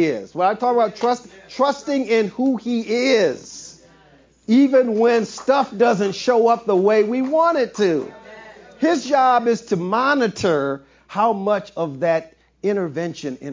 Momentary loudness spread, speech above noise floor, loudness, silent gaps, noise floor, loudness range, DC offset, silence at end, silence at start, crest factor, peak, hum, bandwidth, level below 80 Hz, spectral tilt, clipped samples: 11 LU; 34 dB; -19 LUFS; none; -52 dBFS; 4 LU; under 0.1%; 0 s; 0 s; 14 dB; -4 dBFS; none; 7.6 kHz; -62 dBFS; -5.5 dB/octave; under 0.1%